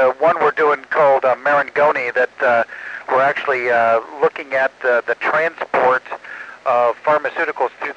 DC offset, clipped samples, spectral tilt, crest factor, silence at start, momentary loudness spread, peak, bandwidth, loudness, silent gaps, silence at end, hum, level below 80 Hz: under 0.1%; under 0.1%; -5 dB/octave; 12 dB; 0 s; 6 LU; -4 dBFS; 8.4 kHz; -17 LUFS; none; 0 s; none; -68 dBFS